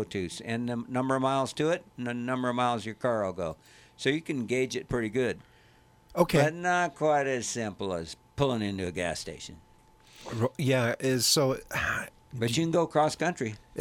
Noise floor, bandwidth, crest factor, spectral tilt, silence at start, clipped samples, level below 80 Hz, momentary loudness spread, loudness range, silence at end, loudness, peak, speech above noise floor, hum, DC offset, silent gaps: -60 dBFS; 16.5 kHz; 20 dB; -4.5 dB/octave; 0 s; under 0.1%; -56 dBFS; 11 LU; 4 LU; 0 s; -29 LUFS; -10 dBFS; 31 dB; none; under 0.1%; none